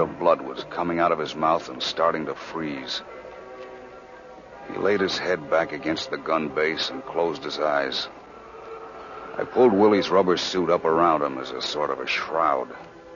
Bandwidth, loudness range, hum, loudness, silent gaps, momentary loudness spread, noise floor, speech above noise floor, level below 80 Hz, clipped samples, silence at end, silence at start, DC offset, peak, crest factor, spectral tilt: 7.4 kHz; 7 LU; none; -24 LUFS; none; 20 LU; -44 dBFS; 20 dB; -60 dBFS; under 0.1%; 0 s; 0 s; under 0.1%; -6 dBFS; 18 dB; -4.5 dB/octave